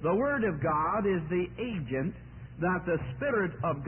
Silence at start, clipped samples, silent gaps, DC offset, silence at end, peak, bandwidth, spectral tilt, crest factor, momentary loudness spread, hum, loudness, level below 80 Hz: 0 s; under 0.1%; none; under 0.1%; 0 s; -18 dBFS; 3.3 kHz; -11.5 dB/octave; 12 dB; 7 LU; none; -30 LUFS; -52 dBFS